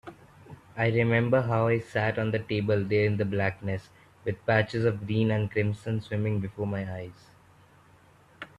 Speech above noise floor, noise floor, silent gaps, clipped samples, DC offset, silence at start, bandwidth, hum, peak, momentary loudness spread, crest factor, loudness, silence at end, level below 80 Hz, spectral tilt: 31 dB; -58 dBFS; none; under 0.1%; under 0.1%; 0.05 s; 8.4 kHz; none; -8 dBFS; 13 LU; 20 dB; -28 LUFS; 0.1 s; -60 dBFS; -8 dB/octave